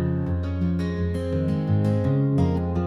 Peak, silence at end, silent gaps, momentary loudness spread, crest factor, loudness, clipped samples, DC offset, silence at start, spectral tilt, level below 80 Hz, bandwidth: -10 dBFS; 0 s; none; 4 LU; 12 dB; -24 LUFS; under 0.1%; under 0.1%; 0 s; -9.5 dB/octave; -44 dBFS; 11 kHz